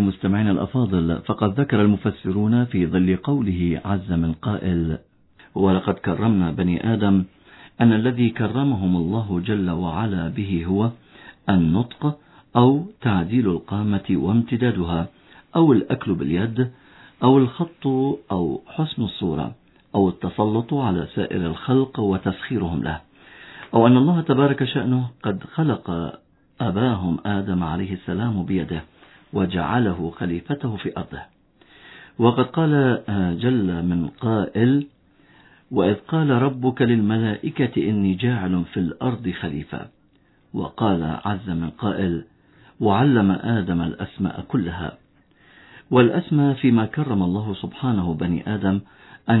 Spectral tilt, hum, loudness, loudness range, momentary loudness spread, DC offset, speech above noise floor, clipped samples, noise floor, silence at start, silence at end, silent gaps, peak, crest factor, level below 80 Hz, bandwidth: -11.5 dB/octave; none; -22 LUFS; 4 LU; 10 LU; under 0.1%; 38 dB; under 0.1%; -58 dBFS; 0 s; 0 s; none; 0 dBFS; 20 dB; -46 dBFS; 4.1 kHz